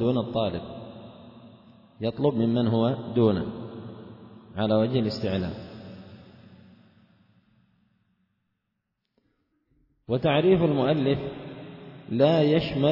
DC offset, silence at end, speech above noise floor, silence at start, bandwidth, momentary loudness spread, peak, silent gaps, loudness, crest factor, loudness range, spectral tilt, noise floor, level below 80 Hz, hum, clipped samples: under 0.1%; 0 s; 57 dB; 0 s; 5.8 kHz; 22 LU; -8 dBFS; none; -25 LUFS; 18 dB; 9 LU; -9 dB/octave; -80 dBFS; -58 dBFS; none; under 0.1%